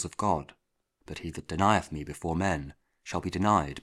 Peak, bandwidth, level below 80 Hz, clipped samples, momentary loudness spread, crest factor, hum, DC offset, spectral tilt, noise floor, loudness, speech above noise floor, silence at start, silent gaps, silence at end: -8 dBFS; 13.5 kHz; -50 dBFS; under 0.1%; 18 LU; 22 dB; none; under 0.1%; -5.5 dB/octave; -69 dBFS; -30 LUFS; 40 dB; 0 s; none; 0 s